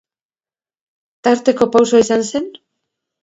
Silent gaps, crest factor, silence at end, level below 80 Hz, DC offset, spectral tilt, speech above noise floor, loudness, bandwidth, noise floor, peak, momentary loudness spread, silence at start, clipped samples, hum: none; 18 dB; 0.75 s; -58 dBFS; under 0.1%; -4 dB/octave; over 76 dB; -15 LUFS; 8 kHz; under -90 dBFS; 0 dBFS; 11 LU; 1.25 s; under 0.1%; none